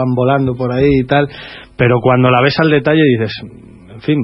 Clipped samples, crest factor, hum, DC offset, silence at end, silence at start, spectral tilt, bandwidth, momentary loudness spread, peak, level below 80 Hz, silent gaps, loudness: under 0.1%; 12 dB; none; under 0.1%; 0 s; 0 s; -9.5 dB/octave; 5.8 kHz; 12 LU; 0 dBFS; -38 dBFS; none; -13 LUFS